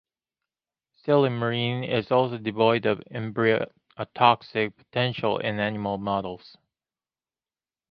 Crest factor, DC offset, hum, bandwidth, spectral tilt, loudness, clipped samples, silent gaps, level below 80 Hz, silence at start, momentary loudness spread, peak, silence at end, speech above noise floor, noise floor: 24 dB; under 0.1%; none; 5.6 kHz; -9 dB/octave; -25 LUFS; under 0.1%; none; -62 dBFS; 1.05 s; 12 LU; -2 dBFS; 1.55 s; over 65 dB; under -90 dBFS